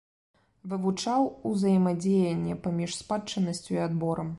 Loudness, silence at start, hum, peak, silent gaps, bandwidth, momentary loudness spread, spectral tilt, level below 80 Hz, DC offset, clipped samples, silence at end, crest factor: -28 LUFS; 0.65 s; none; -14 dBFS; none; 11.5 kHz; 7 LU; -6.5 dB/octave; -60 dBFS; under 0.1%; under 0.1%; 0 s; 14 dB